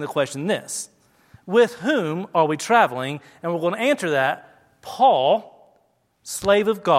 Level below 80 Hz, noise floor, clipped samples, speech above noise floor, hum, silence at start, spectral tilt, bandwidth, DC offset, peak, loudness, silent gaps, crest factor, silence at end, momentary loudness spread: -62 dBFS; -64 dBFS; under 0.1%; 44 dB; none; 0 s; -4 dB/octave; 16 kHz; under 0.1%; -2 dBFS; -21 LUFS; none; 18 dB; 0 s; 13 LU